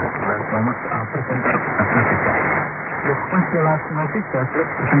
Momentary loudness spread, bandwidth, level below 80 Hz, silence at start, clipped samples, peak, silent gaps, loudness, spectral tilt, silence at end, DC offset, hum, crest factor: 6 LU; 2.9 kHz; -50 dBFS; 0 s; under 0.1%; -4 dBFS; none; -20 LUFS; -14.5 dB/octave; 0 s; under 0.1%; none; 16 dB